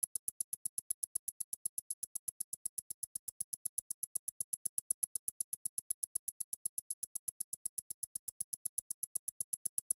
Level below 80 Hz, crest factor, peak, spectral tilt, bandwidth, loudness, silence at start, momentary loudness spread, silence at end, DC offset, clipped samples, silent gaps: -86 dBFS; 26 dB; -18 dBFS; 1 dB/octave; 18 kHz; -40 LUFS; 0.05 s; 5 LU; 0.45 s; under 0.1%; under 0.1%; 0.07-9.53 s